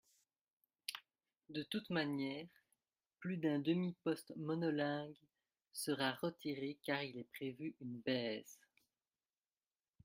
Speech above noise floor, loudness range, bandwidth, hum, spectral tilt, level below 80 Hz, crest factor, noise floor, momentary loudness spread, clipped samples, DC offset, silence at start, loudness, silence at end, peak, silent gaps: over 48 dB; 5 LU; 16 kHz; none; -5 dB/octave; -86 dBFS; 22 dB; under -90 dBFS; 11 LU; under 0.1%; under 0.1%; 0.9 s; -42 LUFS; 1.5 s; -22 dBFS; none